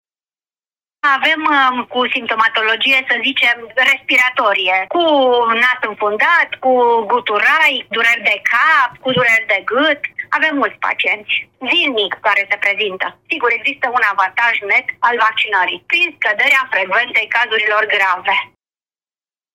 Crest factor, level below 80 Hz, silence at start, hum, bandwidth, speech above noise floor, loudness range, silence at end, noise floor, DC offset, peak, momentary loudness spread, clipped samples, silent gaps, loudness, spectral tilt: 14 dB; -66 dBFS; 1.05 s; none; 16.5 kHz; over 75 dB; 3 LU; 1.1 s; under -90 dBFS; under 0.1%; 0 dBFS; 5 LU; under 0.1%; none; -13 LUFS; -3 dB/octave